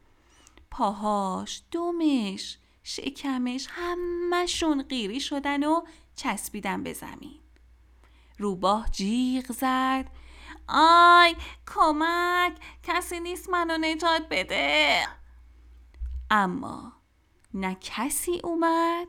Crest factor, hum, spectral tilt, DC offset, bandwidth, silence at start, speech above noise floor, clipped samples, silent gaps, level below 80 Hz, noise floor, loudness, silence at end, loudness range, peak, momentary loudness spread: 20 dB; none; -3.5 dB/octave; under 0.1%; 18 kHz; 0.7 s; 38 dB; under 0.1%; none; -46 dBFS; -63 dBFS; -25 LUFS; 0 s; 9 LU; -6 dBFS; 17 LU